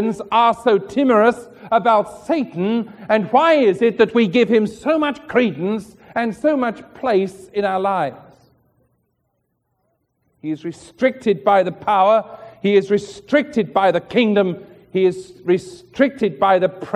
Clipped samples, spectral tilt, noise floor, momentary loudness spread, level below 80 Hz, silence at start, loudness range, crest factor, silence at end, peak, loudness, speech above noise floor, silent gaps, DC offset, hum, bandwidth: under 0.1%; -6.5 dB/octave; -70 dBFS; 11 LU; -60 dBFS; 0 s; 8 LU; 18 dB; 0 s; -2 dBFS; -18 LUFS; 53 dB; none; under 0.1%; none; 11.5 kHz